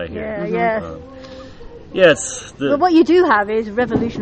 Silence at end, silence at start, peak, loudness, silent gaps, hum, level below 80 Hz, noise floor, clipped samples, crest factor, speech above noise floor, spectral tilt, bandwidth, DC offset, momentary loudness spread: 0 s; 0 s; 0 dBFS; -16 LUFS; none; none; -44 dBFS; -36 dBFS; under 0.1%; 16 dB; 20 dB; -4.5 dB/octave; 9.4 kHz; under 0.1%; 23 LU